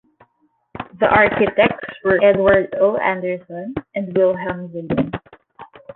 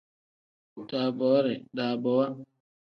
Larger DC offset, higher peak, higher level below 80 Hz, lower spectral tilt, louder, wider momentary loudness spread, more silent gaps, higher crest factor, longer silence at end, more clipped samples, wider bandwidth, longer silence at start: neither; first, 0 dBFS vs -12 dBFS; first, -48 dBFS vs -78 dBFS; about the same, -9.5 dB/octave vs -8.5 dB/octave; first, -18 LUFS vs -28 LUFS; first, 15 LU vs 12 LU; neither; about the same, 18 dB vs 18 dB; second, 0.05 s vs 0.5 s; neither; second, 4.2 kHz vs 5.8 kHz; about the same, 0.75 s vs 0.75 s